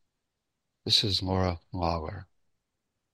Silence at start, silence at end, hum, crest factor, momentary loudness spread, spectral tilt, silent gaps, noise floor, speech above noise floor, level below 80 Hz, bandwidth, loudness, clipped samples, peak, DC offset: 0.85 s; 0.9 s; none; 22 dB; 18 LU; -4.5 dB/octave; none; -83 dBFS; 55 dB; -50 dBFS; 13 kHz; -27 LUFS; under 0.1%; -10 dBFS; under 0.1%